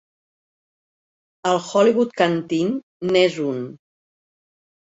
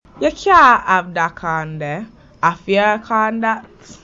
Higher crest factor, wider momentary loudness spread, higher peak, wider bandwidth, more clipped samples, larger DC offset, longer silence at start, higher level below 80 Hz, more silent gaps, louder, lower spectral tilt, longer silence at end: about the same, 20 dB vs 16 dB; second, 10 LU vs 15 LU; about the same, -2 dBFS vs 0 dBFS; about the same, 8 kHz vs 7.8 kHz; neither; neither; first, 1.45 s vs 0.15 s; second, -66 dBFS vs -46 dBFS; first, 2.83-3.00 s vs none; second, -20 LUFS vs -16 LUFS; about the same, -5.5 dB/octave vs -5 dB/octave; first, 1.1 s vs 0.1 s